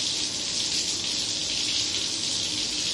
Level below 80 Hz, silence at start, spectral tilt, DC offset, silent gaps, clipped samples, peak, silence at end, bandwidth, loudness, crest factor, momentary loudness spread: -56 dBFS; 0 s; 0 dB/octave; under 0.1%; none; under 0.1%; -10 dBFS; 0 s; 11.5 kHz; -25 LUFS; 16 dB; 2 LU